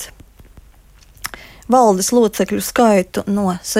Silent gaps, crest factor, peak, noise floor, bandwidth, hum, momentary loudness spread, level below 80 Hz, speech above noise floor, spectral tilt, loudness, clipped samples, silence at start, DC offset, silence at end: none; 16 dB; -2 dBFS; -46 dBFS; 16.5 kHz; none; 18 LU; -46 dBFS; 31 dB; -4.5 dB/octave; -15 LUFS; under 0.1%; 0 s; under 0.1%; 0 s